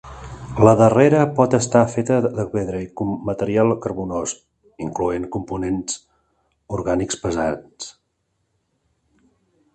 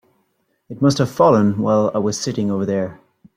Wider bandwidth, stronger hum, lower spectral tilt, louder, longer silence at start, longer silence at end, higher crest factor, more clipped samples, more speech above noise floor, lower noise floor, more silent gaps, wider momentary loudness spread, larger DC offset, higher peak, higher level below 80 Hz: second, 9.4 kHz vs 15 kHz; neither; about the same, -6 dB/octave vs -6.5 dB/octave; about the same, -20 LUFS vs -18 LUFS; second, 0.05 s vs 0.7 s; first, 1.85 s vs 0.45 s; about the same, 20 dB vs 16 dB; neither; about the same, 52 dB vs 50 dB; first, -71 dBFS vs -67 dBFS; neither; first, 17 LU vs 9 LU; neither; about the same, 0 dBFS vs -2 dBFS; first, -46 dBFS vs -58 dBFS